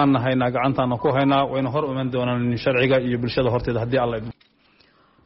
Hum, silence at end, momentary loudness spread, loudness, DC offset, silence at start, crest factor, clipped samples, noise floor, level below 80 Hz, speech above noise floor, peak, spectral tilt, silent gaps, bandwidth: none; 0.95 s; 5 LU; -21 LUFS; under 0.1%; 0 s; 14 dB; under 0.1%; -58 dBFS; -46 dBFS; 37 dB; -8 dBFS; -5.5 dB/octave; none; 5.8 kHz